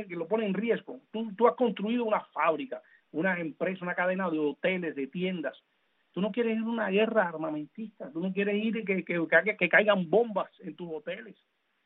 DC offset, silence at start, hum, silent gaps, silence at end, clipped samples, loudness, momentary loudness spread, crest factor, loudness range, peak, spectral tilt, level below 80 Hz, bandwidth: under 0.1%; 0 s; none; none; 0.55 s; under 0.1%; -29 LUFS; 15 LU; 22 dB; 4 LU; -8 dBFS; -4 dB/octave; -80 dBFS; 4.1 kHz